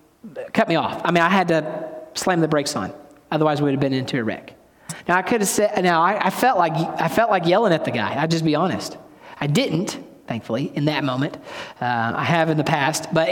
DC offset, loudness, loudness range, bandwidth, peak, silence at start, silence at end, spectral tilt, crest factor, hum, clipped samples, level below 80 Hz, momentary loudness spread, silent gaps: under 0.1%; -20 LUFS; 4 LU; 18 kHz; -4 dBFS; 0.25 s; 0 s; -5 dB/octave; 18 dB; none; under 0.1%; -60 dBFS; 13 LU; none